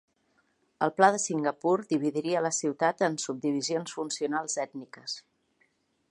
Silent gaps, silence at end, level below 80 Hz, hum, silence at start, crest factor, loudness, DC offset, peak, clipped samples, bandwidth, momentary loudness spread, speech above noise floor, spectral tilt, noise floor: none; 0.9 s; -82 dBFS; none; 0.8 s; 24 dB; -29 LUFS; under 0.1%; -6 dBFS; under 0.1%; 11.5 kHz; 14 LU; 43 dB; -3.5 dB/octave; -71 dBFS